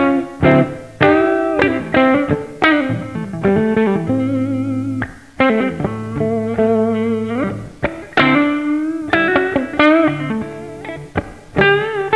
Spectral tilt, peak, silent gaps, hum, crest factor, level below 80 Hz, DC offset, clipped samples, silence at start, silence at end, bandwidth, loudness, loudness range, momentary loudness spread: -7.5 dB/octave; 0 dBFS; none; none; 16 dB; -42 dBFS; 0.3%; under 0.1%; 0 s; 0 s; 11 kHz; -16 LUFS; 3 LU; 11 LU